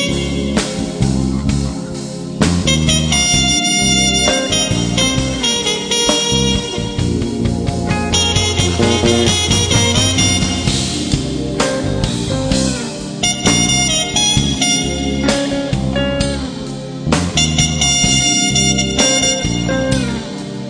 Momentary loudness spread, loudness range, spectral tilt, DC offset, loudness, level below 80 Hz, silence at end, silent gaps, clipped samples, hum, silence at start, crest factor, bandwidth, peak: 8 LU; 3 LU; -3.5 dB/octave; under 0.1%; -14 LUFS; -28 dBFS; 0 s; none; under 0.1%; none; 0 s; 14 dB; 10.5 kHz; 0 dBFS